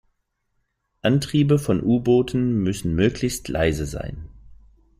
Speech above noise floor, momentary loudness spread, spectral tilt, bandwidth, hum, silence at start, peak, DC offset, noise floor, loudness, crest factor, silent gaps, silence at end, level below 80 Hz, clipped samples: 52 dB; 10 LU; -6.5 dB/octave; 15.5 kHz; none; 1.05 s; -6 dBFS; under 0.1%; -72 dBFS; -21 LUFS; 16 dB; none; 0.45 s; -42 dBFS; under 0.1%